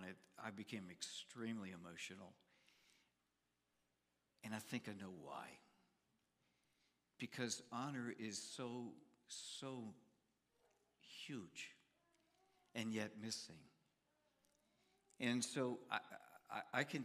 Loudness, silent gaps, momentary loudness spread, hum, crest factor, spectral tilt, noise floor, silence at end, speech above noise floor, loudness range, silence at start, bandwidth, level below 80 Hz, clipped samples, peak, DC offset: -49 LUFS; none; 15 LU; 60 Hz at -80 dBFS; 28 dB; -3.5 dB/octave; -88 dBFS; 0 s; 39 dB; 8 LU; 0 s; 15 kHz; under -90 dBFS; under 0.1%; -24 dBFS; under 0.1%